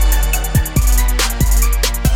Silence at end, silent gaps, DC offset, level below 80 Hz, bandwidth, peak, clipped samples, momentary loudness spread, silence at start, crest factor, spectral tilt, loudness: 0 s; none; under 0.1%; -14 dBFS; 18 kHz; -2 dBFS; under 0.1%; 1 LU; 0 s; 12 dB; -3.5 dB/octave; -16 LUFS